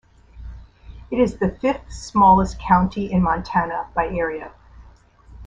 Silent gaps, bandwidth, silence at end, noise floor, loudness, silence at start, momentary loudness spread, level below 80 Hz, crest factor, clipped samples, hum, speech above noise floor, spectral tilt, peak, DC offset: none; 8 kHz; 0 s; -48 dBFS; -20 LUFS; 0.35 s; 20 LU; -38 dBFS; 20 dB; under 0.1%; none; 29 dB; -7 dB/octave; -2 dBFS; under 0.1%